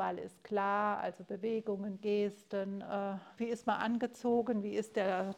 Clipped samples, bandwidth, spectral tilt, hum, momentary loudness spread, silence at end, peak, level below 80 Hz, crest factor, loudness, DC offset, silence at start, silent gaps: under 0.1%; 14 kHz; -6.5 dB/octave; none; 7 LU; 0 s; -18 dBFS; -78 dBFS; 18 dB; -36 LUFS; under 0.1%; 0 s; none